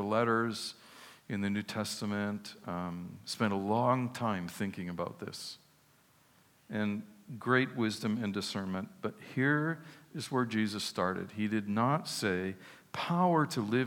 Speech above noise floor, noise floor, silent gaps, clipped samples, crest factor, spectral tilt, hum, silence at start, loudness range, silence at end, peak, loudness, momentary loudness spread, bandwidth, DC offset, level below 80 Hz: 33 dB; -66 dBFS; none; under 0.1%; 20 dB; -5.5 dB/octave; none; 0 s; 4 LU; 0 s; -14 dBFS; -34 LUFS; 13 LU; 17 kHz; under 0.1%; -80 dBFS